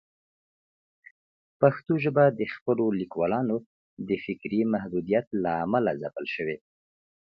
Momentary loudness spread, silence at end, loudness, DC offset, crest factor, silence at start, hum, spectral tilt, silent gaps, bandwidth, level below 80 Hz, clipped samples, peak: 10 LU; 0.85 s; -27 LUFS; under 0.1%; 22 dB; 1.6 s; none; -10 dB/octave; 2.61-2.66 s, 3.66-3.97 s, 5.27-5.31 s; 5.8 kHz; -64 dBFS; under 0.1%; -6 dBFS